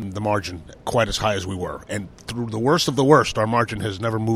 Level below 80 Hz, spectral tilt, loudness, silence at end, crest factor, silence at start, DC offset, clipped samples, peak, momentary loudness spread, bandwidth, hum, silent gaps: -44 dBFS; -5 dB/octave; -21 LUFS; 0 s; 20 dB; 0 s; under 0.1%; under 0.1%; -2 dBFS; 14 LU; 15 kHz; none; none